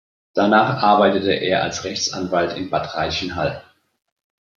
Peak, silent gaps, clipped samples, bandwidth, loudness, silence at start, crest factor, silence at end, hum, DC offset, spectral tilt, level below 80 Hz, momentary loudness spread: -2 dBFS; none; under 0.1%; 7.6 kHz; -19 LUFS; 0.35 s; 18 dB; 0.95 s; none; under 0.1%; -4.5 dB/octave; -52 dBFS; 9 LU